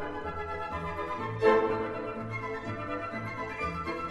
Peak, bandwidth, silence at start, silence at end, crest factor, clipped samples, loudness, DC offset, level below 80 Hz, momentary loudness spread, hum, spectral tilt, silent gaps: -12 dBFS; 11.5 kHz; 0 s; 0 s; 20 dB; under 0.1%; -32 LUFS; under 0.1%; -52 dBFS; 11 LU; none; -7 dB/octave; none